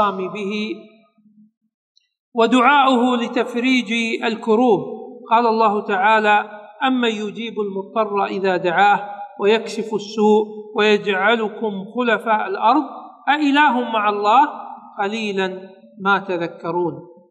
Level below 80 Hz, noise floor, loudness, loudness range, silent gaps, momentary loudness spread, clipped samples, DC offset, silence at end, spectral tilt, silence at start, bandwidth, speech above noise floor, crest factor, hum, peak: -80 dBFS; -53 dBFS; -18 LUFS; 2 LU; 1.57-1.61 s, 1.74-1.95 s, 2.20-2.32 s; 11 LU; under 0.1%; under 0.1%; 0.2 s; -5 dB/octave; 0 s; 10 kHz; 35 dB; 18 dB; none; -2 dBFS